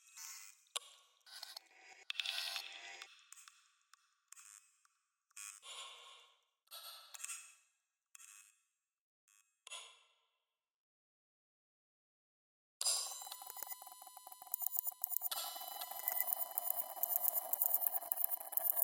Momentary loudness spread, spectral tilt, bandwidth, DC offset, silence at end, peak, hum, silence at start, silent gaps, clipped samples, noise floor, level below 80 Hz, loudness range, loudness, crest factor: 24 LU; 3.5 dB/octave; 17 kHz; under 0.1%; 0 s; -14 dBFS; none; 0.05 s; 9.01-9.28 s, 10.75-12.80 s; under 0.1%; under -90 dBFS; under -90 dBFS; 23 LU; -39 LUFS; 32 dB